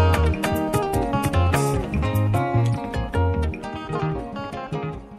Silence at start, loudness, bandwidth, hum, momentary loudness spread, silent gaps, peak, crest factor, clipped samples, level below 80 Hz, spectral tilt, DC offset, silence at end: 0 s; -23 LUFS; 15.5 kHz; none; 9 LU; none; -6 dBFS; 16 dB; under 0.1%; -32 dBFS; -6.5 dB/octave; under 0.1%; 0 s